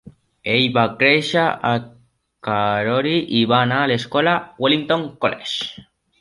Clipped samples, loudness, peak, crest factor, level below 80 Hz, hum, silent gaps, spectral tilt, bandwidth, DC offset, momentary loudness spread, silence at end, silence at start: under 0.1%; -18 LUFS; -2 dBFS; 18 dB; -58 dBFS; none; none; -5.5 dB/octave; 11.5 kHz; under 0.1%; 9 LU; 0.4 s; 0.05 s